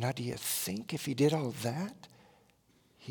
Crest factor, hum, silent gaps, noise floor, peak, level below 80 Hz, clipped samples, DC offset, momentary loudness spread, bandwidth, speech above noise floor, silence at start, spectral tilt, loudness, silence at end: 20 dB; none; none; -68 dBFS; -16 dBFS; -72 dBFS; under 0.1%; under 0.1%; 13 LU; 18 kHz; 34 dB; 0 s; -5 dB/octave; -34 LUFS; 0 s